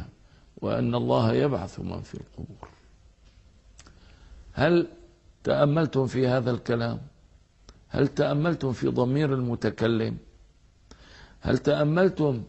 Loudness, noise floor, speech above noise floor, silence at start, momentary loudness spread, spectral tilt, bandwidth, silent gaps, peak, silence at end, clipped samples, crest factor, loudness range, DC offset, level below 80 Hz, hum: -26 LUFS; -57 dBFS; 32 dB; 0 s; 16 LU; -8 dB/octave; 8.4 kHz; none; -6 dBFS; 0 s; under 0.1%; 20 dB; 5 LU; under 0.1%; -50 dBFS; none